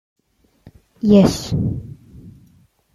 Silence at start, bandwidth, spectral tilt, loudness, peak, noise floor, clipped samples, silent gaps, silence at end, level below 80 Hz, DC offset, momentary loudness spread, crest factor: 1.05 s; 13 kHz; -7 dB/octave; -16 LUFS; -2 dBFS; -61 dBFS; under 0.1%; none; 0.65 s; -42 dBFS; under 0.1%; 17 LU; 18 dB